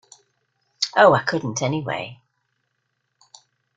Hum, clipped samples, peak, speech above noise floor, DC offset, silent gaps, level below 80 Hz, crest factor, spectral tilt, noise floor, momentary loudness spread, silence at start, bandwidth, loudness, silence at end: none; under 0.1%; -2 dBFS; 55 dB; under 0.1%; none; -62 dBFS; 22 dB; -4 dB/octave; -74 dBFS; 14 LU; 0.8 s; 9.2 kHz; -20 LUFS; 1.6 s